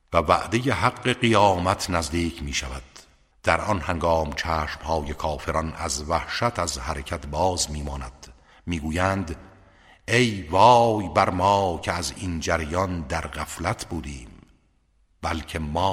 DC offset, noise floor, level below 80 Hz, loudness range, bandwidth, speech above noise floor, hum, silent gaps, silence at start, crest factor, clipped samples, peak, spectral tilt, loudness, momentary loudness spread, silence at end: under 0.1%; -63 dBFS; -40 dBFS; 7 LU; 16 kHz; 40 dB; none; none; 0.1 s; 22 dB; under 0.1%; -2 dBFS; -4.5 dB/octave; -24 LUFS; 14 LU; 0 s